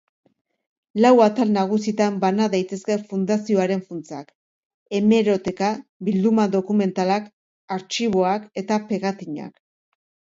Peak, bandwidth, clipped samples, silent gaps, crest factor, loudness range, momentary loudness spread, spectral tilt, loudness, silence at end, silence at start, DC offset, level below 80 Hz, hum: -4 dBFS; 7.8 kHz; under 0.1%; 4.35-4.86 s, 5.89-6.00 s, 7.33-7.68 s; 18 dB; 4 LU; 14 LU; -6 dB/octave; -21 LUFS; 0.85 s; 0.95 s; under 0.1%; -64 dBFS; none